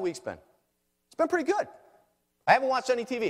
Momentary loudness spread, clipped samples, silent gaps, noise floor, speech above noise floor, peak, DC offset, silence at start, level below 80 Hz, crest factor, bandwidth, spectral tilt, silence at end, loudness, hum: 17 LU; under 0.1%; none; -76 dBFS; 49 dB; -8 dBFS; under 0.1%; 0 s; -72 dBFS; 22 dB; 15 kHz; -4 dB/octave; 0 s; -27 LUFS; 60 Hz at -70 dBFS